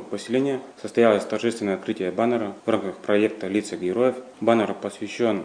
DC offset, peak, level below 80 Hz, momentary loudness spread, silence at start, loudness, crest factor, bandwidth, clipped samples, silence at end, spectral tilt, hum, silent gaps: under 0.1%; -4 dBFS; -70 dBFS; 7 LU; 0 s; -24 LUFS; 18 dB; 10 kHz; under 0.1%; 0 s; -5.5 dB/octave; none; none